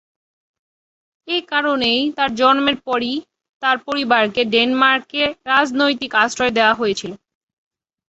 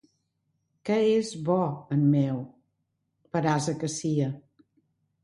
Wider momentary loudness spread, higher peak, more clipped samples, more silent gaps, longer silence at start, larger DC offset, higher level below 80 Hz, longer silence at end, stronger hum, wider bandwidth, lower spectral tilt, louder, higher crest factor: second, 8 LU vs 11 LU; first, 0 dBFS vs -12 dBFS; neither; first, 3.49-3.60 s vs none; first, 1.25 s vs 0.85 s; neither; first, -58 dBFS vs -68 dBFS; about the same, 0.9 s vs 0.85 s; neither; second, 8.2 kHz vs 11.5 kHz; second, -3 dB/octave vs -6.5 dB/octave; first, -17 LUFS vs -27 LUFS; about the same, 18 dB vs 16 dB